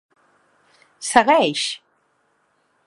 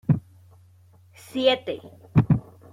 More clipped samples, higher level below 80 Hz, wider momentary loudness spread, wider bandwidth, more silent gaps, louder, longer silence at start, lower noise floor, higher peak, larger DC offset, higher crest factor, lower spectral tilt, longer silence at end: neither; second, -64 dBFS vs -50 dBFS; first, 16 LU vs 13 LU; second, 11.5 kHz vs 13 kHz; neither; first, -18 LUFS vs -24 LUFS; first, 1 s vs 0.1 s; first, -65 dBFS vs -54 dBFS; first, 0 dBFS vs -6 dBFS; neither; about the same, 22 dB vs 20 dB; second, -2.5 dB/octave vs -7.5 dB/octave; first, 1.1 s vs 0.35 s